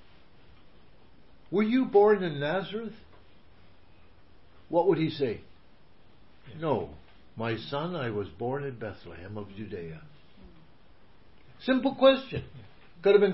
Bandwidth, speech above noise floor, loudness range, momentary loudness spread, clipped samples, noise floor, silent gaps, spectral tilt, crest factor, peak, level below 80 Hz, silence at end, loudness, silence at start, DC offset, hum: 5.8 kHz; 32 dB; 8 LU; 20 LU; under 0.1%; -59 dBFS; none; -10 dB/octave; 22 dB; -8 dBFS; -60 dBFS; 0 s; -28 LUFS; 1.5 s; 0.3%; none